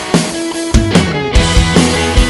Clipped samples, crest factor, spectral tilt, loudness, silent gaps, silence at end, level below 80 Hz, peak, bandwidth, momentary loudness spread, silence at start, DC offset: 0.7%; 10 dB; -4.5 dB/octave; -12 LUFS; none; 0 s; -16 dBFS; 0 dBFS; 12 kHz; 5 LU; 0 s; under 0.1%